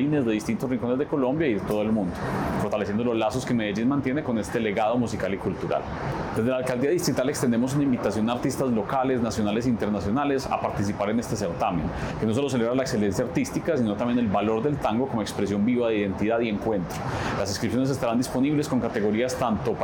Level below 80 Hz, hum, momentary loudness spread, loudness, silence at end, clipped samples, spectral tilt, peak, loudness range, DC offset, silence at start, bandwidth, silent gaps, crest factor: -48 dBFS; none; 4 LU; -25 LUFS; 0 s; under 0.1%; -6 dB/octave; -12 dBFS; 1 LU; under 0.1%; 0 s; 19 kHz; none; 12 dB